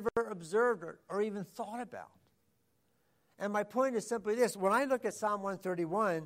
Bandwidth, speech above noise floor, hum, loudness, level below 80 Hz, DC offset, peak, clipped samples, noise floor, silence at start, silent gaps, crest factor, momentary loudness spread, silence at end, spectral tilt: 16 kHz; 43 dB; none; -34 LUFS; -74 dBFS; under 0.1%; -18 dBFS; under 0.1%; -76 dBFS; 0 s; none; 18 dB; 11 LU; 0 s; -5 dB/octave